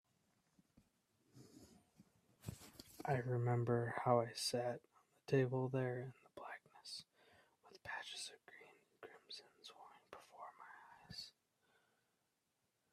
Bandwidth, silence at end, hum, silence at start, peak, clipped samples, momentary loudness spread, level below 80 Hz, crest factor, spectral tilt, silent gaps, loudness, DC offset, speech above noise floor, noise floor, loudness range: 14.5 kHz; 1.65 s; none; 1.35 s; -22 dBFS; under 0.1%; 23 LU; -80 dBFS; 24 dB; -5.5 dB/octave; none; -42 LUFS; under 0.1%; 47 dB; -86 dBFS; 17 LU